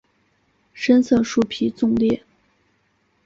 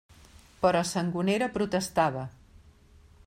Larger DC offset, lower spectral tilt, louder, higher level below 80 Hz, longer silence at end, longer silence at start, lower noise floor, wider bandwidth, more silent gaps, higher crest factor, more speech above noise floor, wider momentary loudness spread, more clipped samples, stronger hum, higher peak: neither; about the same, -5.5 dB/octave vs -5 dB/octave; first, -20 LUFS vs -28 LUFS; about the same, -54 dBFS vs -56 dBFS; about the same, 1.05 s vs 0.95 s; first, 0.75 s vs 0.6 s; first, -65 dBFS vs -56 dBFS; second, 7.6 kHz vs 16 kHz; neither; about the same, 18 dB vs 20 dB; first, 47 dB vs 29 dB; first, 8 LU vs 5 LU; neither; neither; first, -4 dBFS vs -10 dBFS